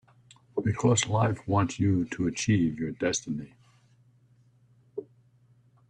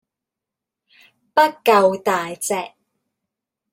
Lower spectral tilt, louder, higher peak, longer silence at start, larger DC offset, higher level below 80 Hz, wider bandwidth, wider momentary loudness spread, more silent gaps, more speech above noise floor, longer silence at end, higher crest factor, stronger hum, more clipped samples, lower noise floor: first, -5.5 dB/octave vs -3.5 dB/octave; second, -28 LUFS vs -18 LUFS; second, -10 dBFS vs -2 dBFS; second, 0.55 s vs 1.35 s; neither; first, -58 dBFS vs -68 dBFS; second, 9.6 kHz vs 16.5 kHz; first, 18 LU vs 10 LU; neither; second, 35 dB vs 68 dB; second, 0.85 s vs 1.05 s; about the same, 20 dB vs 20 dB; neither; neither; second, -62 dBFS vs -85 dBFS